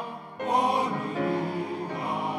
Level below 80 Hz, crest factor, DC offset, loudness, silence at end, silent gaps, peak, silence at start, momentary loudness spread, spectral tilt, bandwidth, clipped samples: -82 dBFS; 18 dB; under 0.1%; -28 LUFS; 0 s; none; -10 dBFS; 0 s; 9 LU; -6 dB/octave; 13 kHz; under 0.1%